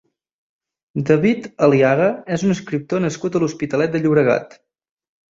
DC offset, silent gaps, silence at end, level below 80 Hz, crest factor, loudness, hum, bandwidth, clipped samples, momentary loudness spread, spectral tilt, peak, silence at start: under 0.1%; none; 0.85 s; -58 dBFS; 16 dB; -18 LUFS; none; 7.8 kHz; under 0.1%; 8 LU; -7 dB/octave; -2 dBFS; 0.95 s